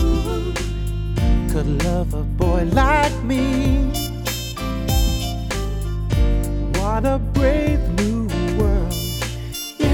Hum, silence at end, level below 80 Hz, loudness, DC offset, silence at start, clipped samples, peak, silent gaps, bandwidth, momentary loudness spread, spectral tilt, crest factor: none; 0 s; -22 dBFS; -21 LUFS; under 0.1%; 0 s; under 0.1%; -4 dBFS; none; 18 kHz; 7 LU; -6 dB/octave; 16 dB